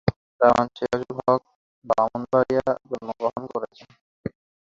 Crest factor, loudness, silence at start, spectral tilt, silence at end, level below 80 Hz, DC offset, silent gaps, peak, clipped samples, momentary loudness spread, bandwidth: 22 dB; -24 LUFS; 0.05 s; -7 dB/octave; 0.45 s; -54 dBFS; under 0.1%; 0.16-0.39 s, 1.55-1.82 s, 4.01-4.24 s; -2 dBFS; under 0.1%; 18 LU; 7.8 kHz